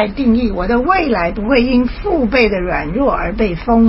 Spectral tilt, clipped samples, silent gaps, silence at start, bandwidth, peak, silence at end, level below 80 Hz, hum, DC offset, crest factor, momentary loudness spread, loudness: -10.5 dB/octave; under 0.1%; none; 0 s; 5.8 kHz; 0 dBFS; 0 s; -26 dBFS; none; under 0.1%; 14 dB; 5 LU; -15 LUFS